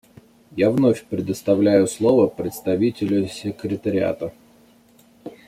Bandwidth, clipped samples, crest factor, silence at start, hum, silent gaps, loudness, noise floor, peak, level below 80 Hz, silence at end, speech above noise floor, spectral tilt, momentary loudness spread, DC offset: 15.5 kHz; under 0.1%; 18 dB; 0.55 s; none; none; -20 LUFS; -53 dBFS; -4 dBFS; -58 dBFS; 0.15 s; 34 dB; -6.5 dB/octave; 13 LU; under 0.1%